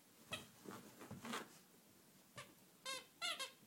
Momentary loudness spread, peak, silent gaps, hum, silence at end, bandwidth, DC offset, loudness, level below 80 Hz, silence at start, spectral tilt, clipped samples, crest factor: 21 LU; -30 dBFS; none; none; 0 s; 16.5 kHz; under 0.1%; -50 LUFS; -86 dBFS; 0 s; -2 dB/octave; under 0.1%; 22 dB